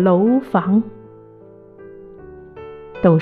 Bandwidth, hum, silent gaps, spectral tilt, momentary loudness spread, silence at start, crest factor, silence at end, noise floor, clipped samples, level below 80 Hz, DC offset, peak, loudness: 4.2 kHz; none; none; -11 dB/octave; 24 LU; 0 s; 18 dB; 0 s; -43 dBFS; under 0.1%; -52 dBFS; under 0.1%; -2 dBFS; -17 LUFS